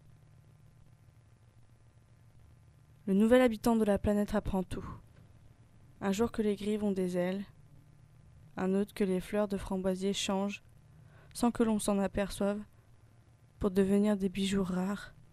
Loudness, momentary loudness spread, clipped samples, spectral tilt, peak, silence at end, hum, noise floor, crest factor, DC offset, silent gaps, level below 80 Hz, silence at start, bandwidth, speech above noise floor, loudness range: -32 LUFS; 13 LU; under 0.1%; -6 dB/octave; -12 dBFS; 0.25 s; none; -61 dBFS; 22 dB; under 0.1%; none; -52 dBFS; 3.05 s; 14.5 kHz; 30 dB; 5 LU